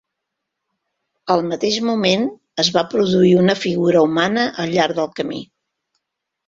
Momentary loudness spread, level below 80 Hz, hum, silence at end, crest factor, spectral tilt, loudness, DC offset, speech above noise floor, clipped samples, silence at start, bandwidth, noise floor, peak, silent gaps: 10 LU; -58 dBFS; none; 1.05 s; 18 dB; -5 dB/octave; -17 LUFS; under 0.1%; 62 dB; under 0.1%; 1.25 s; 7.8 kHz; -79 dBFS; -2 dBFS; none